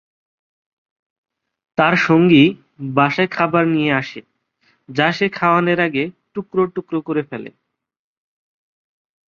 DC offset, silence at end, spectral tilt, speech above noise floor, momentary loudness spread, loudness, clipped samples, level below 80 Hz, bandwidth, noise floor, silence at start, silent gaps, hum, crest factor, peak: under 0.1%; 1.8 s; -7 dB/octave; 46 dB; 16 LU; -17 LUFS; under 0.1%; -60 dBFS; 7 kHz; -62 dBFS; 1.8 s; none; none; 18 dB; -2 dBFS